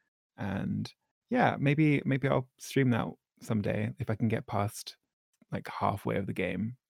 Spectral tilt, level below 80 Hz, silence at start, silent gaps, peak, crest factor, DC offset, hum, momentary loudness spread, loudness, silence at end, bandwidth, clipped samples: -7 dB/octave; -64 dBFS; 0.4 s; 1.11-1.22 s, 5.13-5.33 s; -12 dBFS; 20 dB; under 0.1%; none; 14 LU; -31 LUFS; 0.15 s; 16 kHz; under 0.1%